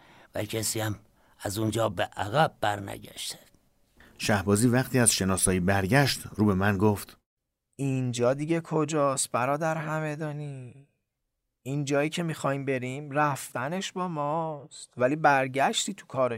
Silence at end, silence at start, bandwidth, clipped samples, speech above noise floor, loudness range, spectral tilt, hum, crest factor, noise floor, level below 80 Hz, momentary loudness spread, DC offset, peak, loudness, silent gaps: 0 s; 0.35 s; 16 kHz; under 0.1%; 54 dB; 6 LU; -4.5 dB/octave; none; 20 dB; -82 dBFS; -58 dBFS; 13 LU; under 0.1%; -8 dBFS; -27 LUFS; 7.26-7.37 s